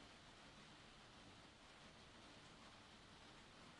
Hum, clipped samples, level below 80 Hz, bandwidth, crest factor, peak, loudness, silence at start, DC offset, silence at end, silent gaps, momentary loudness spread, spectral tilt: none; under 0.1%; -76 dBFS; 11 kHz; 14 dB; -50 dBFS; -63 LUFS; 0 s; under 0.1%; 0 s; none; 1 LU; -3.5 dB/octave